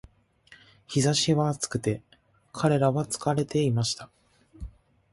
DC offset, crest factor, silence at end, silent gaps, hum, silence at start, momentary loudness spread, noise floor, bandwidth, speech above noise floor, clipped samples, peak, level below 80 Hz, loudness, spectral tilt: under 0.1%; 18 dB; 0.45 s; none; none; 0.5 s; 22 LU; -57 dBFS; 11.5 kHz; 32 dB; under 0.1%; -10 dBFS; -54 dBFS; -26 LUFS; -5 dB/octave